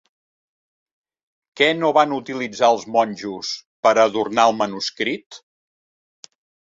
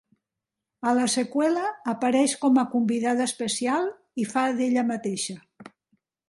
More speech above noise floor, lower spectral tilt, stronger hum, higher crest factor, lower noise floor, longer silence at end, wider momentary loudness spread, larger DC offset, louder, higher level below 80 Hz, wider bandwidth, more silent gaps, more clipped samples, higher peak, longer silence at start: first, over 71 dB vs 63 dB; about the same, -3.5 dB/octave vs -3.5 dB/octave; neither; about the same, 20 dB vs 16 dB; about the same, under -90 dBFS vs -87 dBFS; first, 1.4 s vs 0.65 s; first, 12 LU vs 9 LU; neither; first, -19 LUFS vs -25 LUFS; first, -68 dBFS vs -74 dBFS; second, 7.8 kHz vs 11.5 kHz; first, 3.66-3.83 s, 5.26-5.30 s vs none; neither; first, -2 dBFS vs -10 dBFS; first, 1.55 s vs 0.85 s